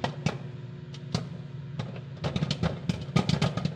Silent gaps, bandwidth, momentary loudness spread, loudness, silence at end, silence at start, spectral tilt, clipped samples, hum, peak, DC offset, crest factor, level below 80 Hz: none; 10 kHz; 13 LU; -32 LUFS; 0 s; 0 s; -6 dB/octave; under 0.1%; none; -10 dBFS; under 0.1%; 20 dB; -52 dBFS